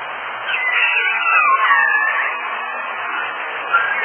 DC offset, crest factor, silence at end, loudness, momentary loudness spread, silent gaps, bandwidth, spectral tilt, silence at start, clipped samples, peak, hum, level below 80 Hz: under 0.1%; 16 dB; 0 s; -16 LUFS; 11 LU; none; 3.4 kHz; -3 dB/octave; 0 s; under 0.1%; -2 dBFS; none; -78 dBFS